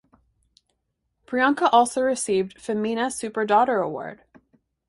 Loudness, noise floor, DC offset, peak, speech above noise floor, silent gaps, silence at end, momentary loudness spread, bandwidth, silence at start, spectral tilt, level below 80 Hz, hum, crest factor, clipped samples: -22 LUFS; -76 dBFS; under 0.1%; -6 dBFS; 54 dB; none; 0.75 s; 11 LU; 11.5 kHz; 1.3 s; -3.5 dB/octave; -66 dBFS; none; 20 dB; under 0.1%